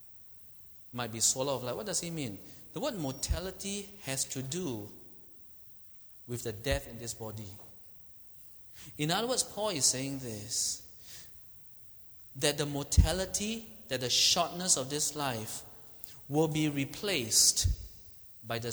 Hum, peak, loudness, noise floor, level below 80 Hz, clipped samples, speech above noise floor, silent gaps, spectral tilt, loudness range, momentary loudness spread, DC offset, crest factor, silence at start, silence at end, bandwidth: none; -10 dBFS; -31 LUFS; -53 dBFS; -44 dBFS; under 0.1%; 20 dB; none; -3 dB/octave; 10 LU; 22 LU; under 0.1%; 24 dB; 0 s; 0 s; over 20 kHz